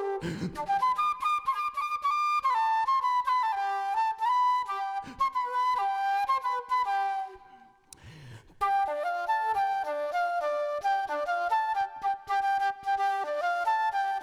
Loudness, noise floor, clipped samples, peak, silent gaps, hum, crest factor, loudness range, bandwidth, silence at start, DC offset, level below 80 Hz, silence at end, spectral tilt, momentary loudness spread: -28 LUFS; -55 dBFS; under 0.1%; -18 dBFS; none; none; 12 dB; 4 LU; 15 kHz; 0 s; under 0.1%; -64 dBFS; 0 s; -4 dB/octave; 6 LU